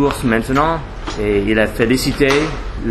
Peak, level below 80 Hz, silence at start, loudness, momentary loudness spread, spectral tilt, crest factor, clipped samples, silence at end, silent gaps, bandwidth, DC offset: -2 dBFS; -28 dBFS; 0 s; -16 LUFS; 9 LU; -5.5 dB/octave; 14 dB; under 0.1%; 0 s; none; 13 kHz; under 0.1%